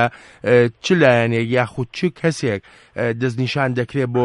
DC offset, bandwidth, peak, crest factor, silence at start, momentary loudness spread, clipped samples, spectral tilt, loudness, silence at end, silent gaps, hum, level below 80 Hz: under 0.1%; 11.5 kHz; -2 dBFS; 16 dB; 0 s; 10 LU; under 0.1%; -6.5 dB/octave; -19 LUFS; 0 s; none; none; -56 dBFS